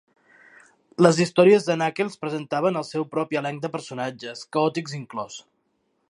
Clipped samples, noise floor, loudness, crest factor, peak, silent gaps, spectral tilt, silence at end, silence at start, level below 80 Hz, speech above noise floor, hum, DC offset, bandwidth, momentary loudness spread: under 0.1%; -71 dBFS; -23 LUFS; 24 dB; 0 dBFS; none; -5.5 dB/octave; 0.7 s; 1 s; -72 dBFS; 48 dB; none; under 0.1%; 11 kHz; 16 LU